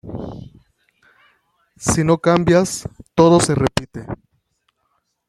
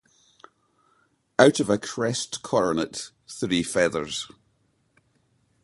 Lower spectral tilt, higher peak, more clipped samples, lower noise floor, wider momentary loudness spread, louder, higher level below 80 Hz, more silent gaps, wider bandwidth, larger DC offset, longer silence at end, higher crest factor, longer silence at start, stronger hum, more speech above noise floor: first, -5.5 dB/octave vs -4 dB/octave; about the same, 0 dBFS vs 0 dBFS; neither; about the same, -69 dBFS vs -68 dBFS; first, 20 LU vs 14 LU; first, -16 LUFS vs -24 LUFS; first, -44 dBFS vs -60 dBFS; neither; first, 13.5 kHz vs 11.5 kHz; neither; second, 1.15 s vs 1.35 s; second, 20 dB vs 26 dB; second, 0.05 s vs 1.4 s; neither; first, 53 dB vs 44 dB